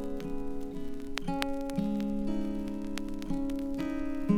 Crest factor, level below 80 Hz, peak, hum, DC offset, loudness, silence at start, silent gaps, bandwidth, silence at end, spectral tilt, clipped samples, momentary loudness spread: 24 dB; -42 dBFS; -8 dBFS; none; under 0.1%; -35 LUFS; 0 s; none; 16 kHz; 0 s; -6.5 dB/octave; under 0.1%; 6 LU